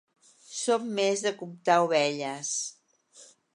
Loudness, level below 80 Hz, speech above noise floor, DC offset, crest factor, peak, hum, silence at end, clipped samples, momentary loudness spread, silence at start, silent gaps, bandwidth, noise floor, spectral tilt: -28 LUFS; -86 dBFS; 30 dB; under 0.1%; 20 dB; -8 dBFS; none; 0.3 s; under 0.1%; 9 LU; 0.5 s; none; 11.5 kHz; -57 dBFS; -3 dB/octave